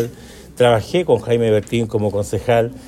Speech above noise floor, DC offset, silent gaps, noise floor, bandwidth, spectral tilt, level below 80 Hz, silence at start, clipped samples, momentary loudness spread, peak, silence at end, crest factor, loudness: 21 dB; under 0.1%; none; -37 dBFS; 14.5 kHz; -6 dB/octave; -44 dBFS; 0 s; under 0.1%; 5 LU; -2 dBFS; 0.05 s; 16 dB; -17 LUFS